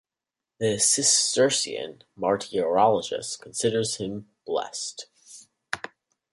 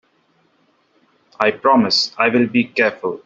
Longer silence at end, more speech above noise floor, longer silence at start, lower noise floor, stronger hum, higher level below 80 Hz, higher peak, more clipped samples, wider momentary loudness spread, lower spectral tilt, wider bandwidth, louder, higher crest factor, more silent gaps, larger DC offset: first, 0.45 s vs 0.1 s; first, 64 dB vs 44 dB; second, 0.6 s vs 1.4 s; first, -89 dBFS vs -60 dBFS; neither; about the same, -66 dBFS vs -62 dBFS; second, -6 dBFS vs 0 dBFS; neither; first, 16 LU vs 5 LU; second, -2 dB/octave vs -4.5 dB/octave; first, 11.5 kHz vs 7.8 kHz; second, -24 LUFS vs -16 LUFS; about the same, 20 dB vs 18 dB; neither; neither